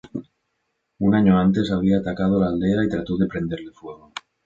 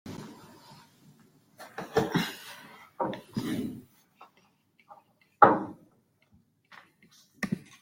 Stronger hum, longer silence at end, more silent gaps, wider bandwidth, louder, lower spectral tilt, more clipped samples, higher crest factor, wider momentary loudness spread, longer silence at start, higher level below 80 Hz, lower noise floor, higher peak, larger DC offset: neither; about the same, 0.25 s vs 0.2 s; neither; second, 7.4 kHz vs 16.5 kHz; first, -20 LUFS vs -29 LUFS; first, -8.5 dB/octave vs -5.5 dB/octave; neither; second, 18 dB vs 30 dB; second, 20 LU vs 27 LU; about the same, 0.15 s vs 0.05 s; first, -46 dBFS vs -68 dBFS; first, -74 dBFS vs -67 dBFS; about the same, -4 dBFS vs -4 dBFS; neither